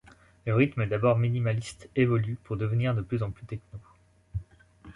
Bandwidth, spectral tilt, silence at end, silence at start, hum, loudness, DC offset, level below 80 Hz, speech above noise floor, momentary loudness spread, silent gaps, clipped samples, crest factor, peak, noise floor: 11 kHz; -8 dB/octave; 0.05 s; 0.45 s; none; -28 LUFS; under 0.1%; -52 dBFS; 25 dB; 15 LU; none; under 0.1%; 20 dB; -10 dBFS; -52 dBFS